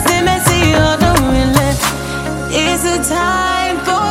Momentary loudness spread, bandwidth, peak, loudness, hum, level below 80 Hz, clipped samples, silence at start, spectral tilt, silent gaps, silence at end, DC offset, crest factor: 6 LU; 17 kHz; 0 dBFS; -13 LUFS; none; -26 dBFS; under 0.1%; 0 s; -4 dB/octave; none; 0 s; under 0.1%; 14 dB